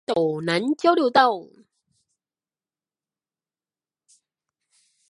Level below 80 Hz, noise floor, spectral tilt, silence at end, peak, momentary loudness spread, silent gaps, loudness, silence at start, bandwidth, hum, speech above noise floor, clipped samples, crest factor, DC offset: -74 dBFS; under -90 dBFS; -5.5 dB/octave; 3.65 s; -2 dBFS; 6 LU; none; -21 LUFS; 0.1 s; 11.5 kHz; none; over 69 dB; under 0.1%; 22 dB; under 0.1%